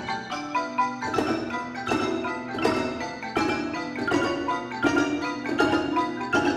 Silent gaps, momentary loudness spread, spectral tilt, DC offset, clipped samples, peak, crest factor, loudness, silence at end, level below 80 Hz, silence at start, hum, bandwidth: none; 7 LU; -4.5 dB/octave; under 0.1%; under 0.1%; -6 dBFS; 20 dB; -26 LUFS; 0 s; -56 dBFS; 0 s; none; 13.5 kHz